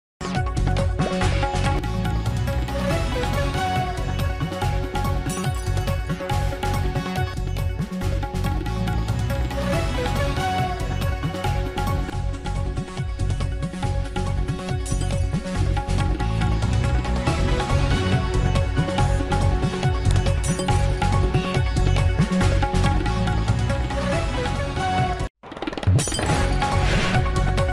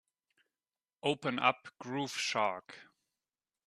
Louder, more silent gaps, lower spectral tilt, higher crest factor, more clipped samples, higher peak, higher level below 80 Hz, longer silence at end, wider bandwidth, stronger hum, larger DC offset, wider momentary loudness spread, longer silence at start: first, -24 LUFS vs -34 LUFS; first, 25.30-25.35 s vs none; first, -6 dB/octave vs -3.5 dB/octave; second, 14 dB vs 26 dB; neither; first, -8 dBFS vs -12 dBFS; first, -26 dBFS vs -82 dBFS; second, 0 s vs 0.85 s; first, 15 kHz vs 13.5 kHz; neither; neither; second, 6 LU vs 15 LU; second, 0.2 s vs 1.05 s